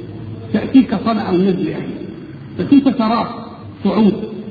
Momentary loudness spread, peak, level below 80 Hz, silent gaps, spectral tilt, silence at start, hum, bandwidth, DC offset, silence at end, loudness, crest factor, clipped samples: 18 LU; 0 dBFS; -48 dBFS; none; -10 dB/octave; 0 s; none; 4.9 kHz; under 0.1%; 0 s; -16 LUFS; 16 dB; under 0.1%